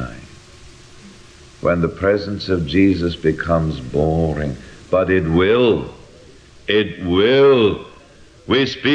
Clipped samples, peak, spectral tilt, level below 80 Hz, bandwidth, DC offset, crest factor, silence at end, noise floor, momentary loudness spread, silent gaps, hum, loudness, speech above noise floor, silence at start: under 0.1%; -2 dBFS; -7 dB/octave; -38 dBFS; 9.6 kHz; under 0.1%; 16 dB; 0 s; -45 dBFS; 11 LU; none; none; -17 LUFS; 29 dB; 0 s